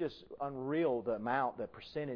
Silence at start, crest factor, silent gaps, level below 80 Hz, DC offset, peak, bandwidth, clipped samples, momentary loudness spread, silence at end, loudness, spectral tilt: 0 s; 16 dB; none; -70 dBFS; under 0.1%; -20 dBFS; 5.4 kHz; under 0.1%; 9 LU; 0 s; -37 LUFS; -5 dB/octave